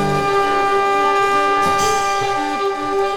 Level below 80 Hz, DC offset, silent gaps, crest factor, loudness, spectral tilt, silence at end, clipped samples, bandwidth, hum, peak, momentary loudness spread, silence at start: -44 dBFS; under 0.1%; none; 12 dB; -16 LUFS; -3.5 dB/octave; 0 s; under 0.1%; 17.5 kHz; none; -6 dBFS; 4 LU; 0 s